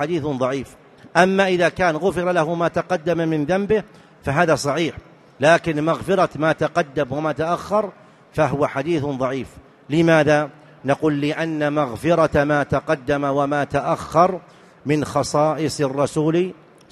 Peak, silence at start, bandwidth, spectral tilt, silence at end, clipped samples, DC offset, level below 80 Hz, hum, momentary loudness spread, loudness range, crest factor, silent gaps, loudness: 0 dBFS; 0 s; 13 kHz; -6 dB/octave; 0.4 s; under 0.1%; under 0.1%; -48 dBFS; none; 7 LU; 2 LU; 20 dB; none; -20 LUFS